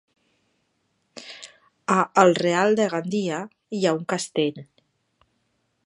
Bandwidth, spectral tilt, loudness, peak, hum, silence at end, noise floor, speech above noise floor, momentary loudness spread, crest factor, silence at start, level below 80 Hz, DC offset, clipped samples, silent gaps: 11.5 kHz; -5 dB/octave; -22 LUFS; -2 dBFS; none; 1.2 s; -72 dBFS; 50 dB; 22 LU; 24 dB; 1.15 s; -74 dBFS; under 0.1%; under 0.1%; none